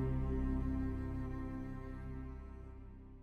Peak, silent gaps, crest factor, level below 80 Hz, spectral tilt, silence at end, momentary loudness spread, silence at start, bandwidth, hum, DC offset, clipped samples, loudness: -26 dBFS; none; 14 dB; -44 dBFS; -10 dB/octave; 0 s; 15 LU; 0 s; 4.8 kHz; none; under 0.1%; under 0.1%; -42 LUFS